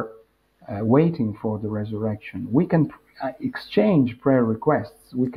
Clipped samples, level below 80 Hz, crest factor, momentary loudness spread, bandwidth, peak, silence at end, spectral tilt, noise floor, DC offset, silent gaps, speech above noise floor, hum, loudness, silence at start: under 0.1%; -58 dBFS; 18 dB; 13 LU; 11 kHz; -6 dBFS; 0 s; -10 dB/octave; -55 dBFS; under 0.1%; none; 33 dB; none; -23 LUFS; 0 s